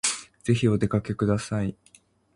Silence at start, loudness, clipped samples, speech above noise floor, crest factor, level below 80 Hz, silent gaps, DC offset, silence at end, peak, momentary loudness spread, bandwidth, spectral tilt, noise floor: 0.05 s; -26 LUFS; under 0.1%; 35 dB; 18 dB; -50 dBFS; none; under 0.1%; 0.6 s; -10 dBFS; 8 LU; 11.5 kHz; -5 dB/octave; -59 dBFS